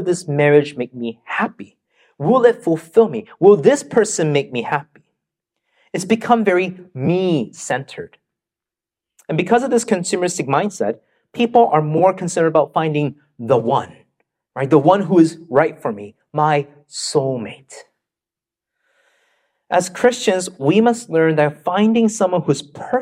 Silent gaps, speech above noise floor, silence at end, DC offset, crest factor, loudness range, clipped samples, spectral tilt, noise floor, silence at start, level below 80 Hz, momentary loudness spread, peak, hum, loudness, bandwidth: none; 72 dB; 0 s; under 0.1%; 18 dB; 6 LU; under 0.1%; -5.5 dB/octave; -88 dBFS; 0 s; -64 dBFS; 13 LU; 0 dBFS; none; -17 LUFS; 14 kHz